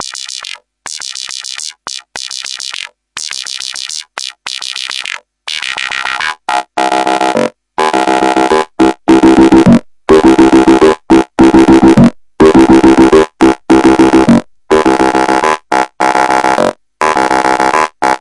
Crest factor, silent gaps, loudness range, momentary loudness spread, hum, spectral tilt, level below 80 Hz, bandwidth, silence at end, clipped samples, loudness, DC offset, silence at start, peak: 10 dB; none; 13 LU; 16 LU; none; -5 dB/octave; -34 dBFS; 11.5 kHz; 0 s; 1%; -9 LUFS; under 0.1%; 0 s; 0 dBFS